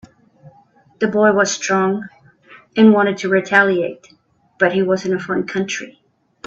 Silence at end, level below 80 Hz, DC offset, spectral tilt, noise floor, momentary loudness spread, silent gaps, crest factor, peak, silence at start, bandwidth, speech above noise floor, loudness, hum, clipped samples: 0.55 s; -62 dBFS; under 0.1%; -5 dB/octave; -52 dBFS; 13 LU; none; 18 dB; 0 dBFS; 0.45 s; 7.8 kHz; 36 dB; -17 LUFS; none; under 0.1%